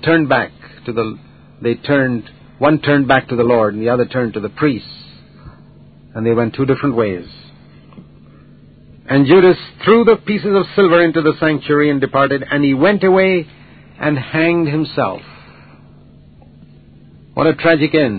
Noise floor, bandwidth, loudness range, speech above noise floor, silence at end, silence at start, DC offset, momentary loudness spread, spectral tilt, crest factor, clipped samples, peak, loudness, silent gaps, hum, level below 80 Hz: -43 dBFS; 4.8 kHz; 8 LU; 29 dB; 0 s; 0.05 s; 0.2%; 13 LU; -11 dB/octave; 16 dB; under 0.1%; 0 dBFS; -14 LUFS; none; none; -48 dBFS